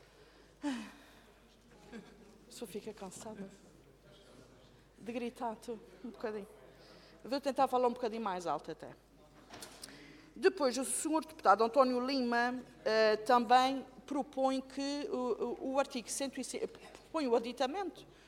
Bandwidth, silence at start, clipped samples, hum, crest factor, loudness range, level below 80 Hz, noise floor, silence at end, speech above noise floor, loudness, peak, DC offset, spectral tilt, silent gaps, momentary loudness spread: 16.5 kHz; 0.6 s; under 0.1%; none; 24 dB; 17 LU; -70 dBFS; -62 dBFS; 0.25 s; 28 dB; -34 LUFS; -14 dBFS; under 0.1%; -3 dB/octave; none; 22 LU